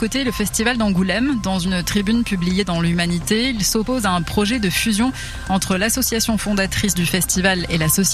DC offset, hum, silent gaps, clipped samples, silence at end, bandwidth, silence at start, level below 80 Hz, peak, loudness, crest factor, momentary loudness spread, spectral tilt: under 0.1%; none; none; under 0.1%; 0 s; 14.5 kHz; 0 s; -34 dBFS; -2 dBFS; -18 LUFS; 16 dB; 3 LU; -4 dB/octave